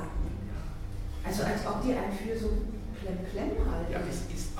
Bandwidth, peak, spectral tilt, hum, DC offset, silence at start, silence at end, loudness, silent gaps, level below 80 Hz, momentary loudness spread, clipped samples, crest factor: 16 kHz; -16 dBFS; -6 dB/octave; none; under 0.1%; 0 s; 0 s; -34 LUFS; none; -36 dBFS; 9 LU; under 0.1%; 16 dB